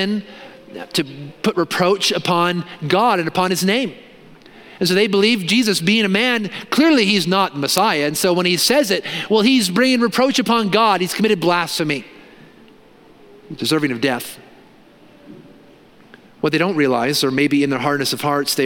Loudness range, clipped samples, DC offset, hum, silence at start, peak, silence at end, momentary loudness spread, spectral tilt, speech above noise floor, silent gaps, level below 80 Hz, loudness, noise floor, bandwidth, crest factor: 9 LU; under 0.1%; under 0.1%; none; 0 s; 0 dBFS; 0 s; 8 LU; -4 dB/octave; 30 dB; none; -62 dBFS; -17 LUFS; -47 dBFS; 17 kHz; 18 dB